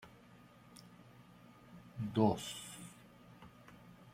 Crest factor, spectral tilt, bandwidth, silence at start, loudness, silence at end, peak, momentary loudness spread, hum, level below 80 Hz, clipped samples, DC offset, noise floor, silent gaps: 26 dB; -6 dB/octave; 16 kHz; 0 s; -38 LUFS; 0.05 s; -16 dBFS; 27 LU; none; -70 dBFS; under 0.1%; under 0.1%; -61 dBFS; none